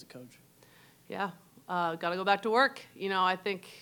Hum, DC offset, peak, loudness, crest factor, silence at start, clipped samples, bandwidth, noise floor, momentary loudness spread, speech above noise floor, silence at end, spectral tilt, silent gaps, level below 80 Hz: none; under 0.1%; -12 dBFS; -31 LUFS; 22 dB; 0 s; under 0.1%; 19 kHz; -60 dBFS; 14 LU; 28 dB; 0 s; -4.5 dB/octave; none; -84 dBFS